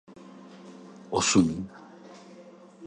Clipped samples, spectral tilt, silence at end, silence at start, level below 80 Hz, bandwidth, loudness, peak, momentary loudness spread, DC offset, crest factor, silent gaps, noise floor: under 0.1%; -4 dB/octave; 0 s; 0.25 s; -56 dBFS; 11 kHz; -25 LUFS; -8 dBFS; 27 LU; under 0.1%; 22 dB; none; -50 dBFS